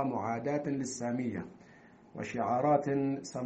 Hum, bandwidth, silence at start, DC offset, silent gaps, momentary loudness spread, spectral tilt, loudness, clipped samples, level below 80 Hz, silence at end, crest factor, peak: none; 8.4 kHz; 0 s; under 0.1%; none; 14 LU; -6.5 dB/octave; -33 LUFS; under 0.1%; -70 dBFS; 0 s; 20 dB; -14 dBFS